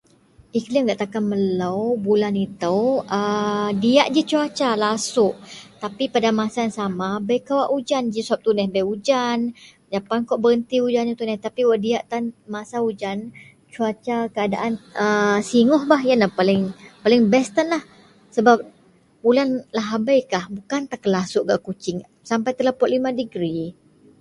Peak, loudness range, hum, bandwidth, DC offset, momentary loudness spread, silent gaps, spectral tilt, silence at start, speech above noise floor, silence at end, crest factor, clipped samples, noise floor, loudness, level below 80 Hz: 0 dBFS; 5 LU; none; 11.5 kHz; under 0.1%; 11 LU; none; -5 dB/octave; 0.55 s; 35 dB; 0.5 s; 20 dB; under 0.1%; -55 dBFS; -21 LUFS; -62 dBFS